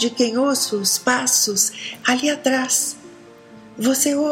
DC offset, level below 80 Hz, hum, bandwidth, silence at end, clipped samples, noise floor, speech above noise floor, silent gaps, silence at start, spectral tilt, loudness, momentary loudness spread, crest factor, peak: under 0.1%; -68 dBFS; none; 16.5 kHz; 0 s; under 0.1%; -43 dBFS; 24 dB; none; 0 s; -1.5 dB/octave; -18 LUFS; 6 LU; 16 dB; -4 dBFS